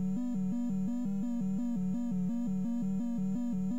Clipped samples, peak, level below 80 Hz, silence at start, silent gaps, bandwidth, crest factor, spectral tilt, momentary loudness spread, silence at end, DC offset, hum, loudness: under 0.1%; -26 dBFS; -60 dBFS; 0 s; none; 7.8 kHz; 6 dB; -9 dB/octave; 0 LU; 0 s; 0.9%; none; -34 LUFS